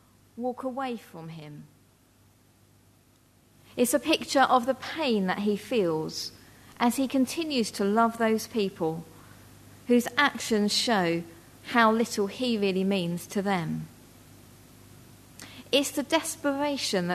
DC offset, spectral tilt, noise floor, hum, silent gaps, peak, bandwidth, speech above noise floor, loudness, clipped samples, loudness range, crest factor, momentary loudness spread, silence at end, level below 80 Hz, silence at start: under 0.1%; -4 dB/octave; -61 dBFS; none; none; -8 dBFS; 13.5 kHz; 34 dB; -27 LUFS; under 0.1%; 7 LU; 22 dB; 17 LU; 0 s; -64 dBFS; 0.35 s